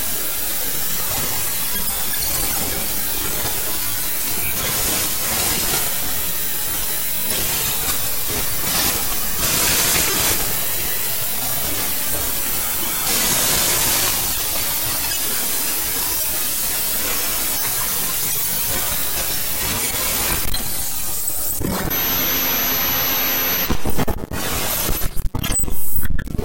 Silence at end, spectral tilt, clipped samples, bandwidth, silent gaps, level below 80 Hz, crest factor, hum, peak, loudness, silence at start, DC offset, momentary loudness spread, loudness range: 0 s; -1.5 dB/octave; under 0.1%; 16.5 kHz; none; -34 dBFS; 14 dB; none; -4 dBFS; -18 LUFS; 0 s; 3%; 5 LU; 2 LU